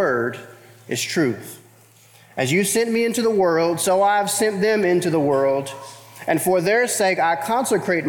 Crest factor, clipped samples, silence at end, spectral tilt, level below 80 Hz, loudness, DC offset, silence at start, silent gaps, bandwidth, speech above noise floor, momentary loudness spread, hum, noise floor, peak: 14 dB; under 0.1%; 0 s; -4 dB/octave; -66 dBFS; -19 LUFS; under 0.1%; 0 s; none; 20 kHz; 31 dB; 13 LU; none; -51 dBFS; -6 dBFS